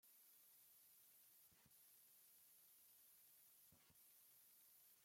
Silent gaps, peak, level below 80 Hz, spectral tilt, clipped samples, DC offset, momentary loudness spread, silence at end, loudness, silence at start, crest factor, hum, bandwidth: none; -60 dBFS; under -90 dBFS; -0.5 dB/octave; under 0.1%; under 0.1%; 1 LU; 0 s; -69 LUFS; 0 s; 12 dB; none; 16.5 kHz